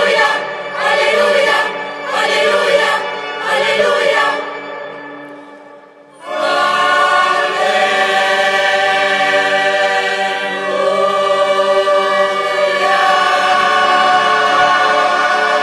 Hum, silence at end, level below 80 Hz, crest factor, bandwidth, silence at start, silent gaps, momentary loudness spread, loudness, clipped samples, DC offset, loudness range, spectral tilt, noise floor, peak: none; 0 s; -62 dBFS; 12 dB; 13 kHz; 0 s; none; 9 LU; -13 LUFS; under 0.1%; under 0.1%; 5 LU; -2 dB/octave; -40 dBFS; -2 dBFS